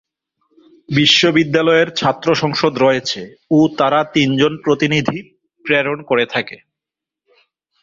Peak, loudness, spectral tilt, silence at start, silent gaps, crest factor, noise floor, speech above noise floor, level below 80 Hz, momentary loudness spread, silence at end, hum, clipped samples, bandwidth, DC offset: 0 dBFS; -15 LUFS; -5 dB/octave; 0.9 s; none; 16 dB; -85 dBFS; 70 dB; -54 dBFS; 11 LU; 1.25 s; none; under 0.1%; 7.6 kHz; under 0.1%